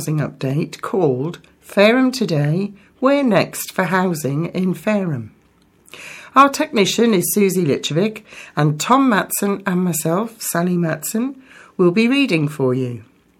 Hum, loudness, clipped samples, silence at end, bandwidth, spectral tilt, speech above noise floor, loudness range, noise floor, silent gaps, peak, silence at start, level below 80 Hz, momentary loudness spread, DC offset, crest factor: none; -18 LUFS; under 0.1%; 0.4 s; 17 kHz; -5 dB/octave; 37 dB; 2 LU; -55 dBFS; none; 0 dBFS; 0 s; -62 dBFS; 12 LU; under 0.1%; 18 dB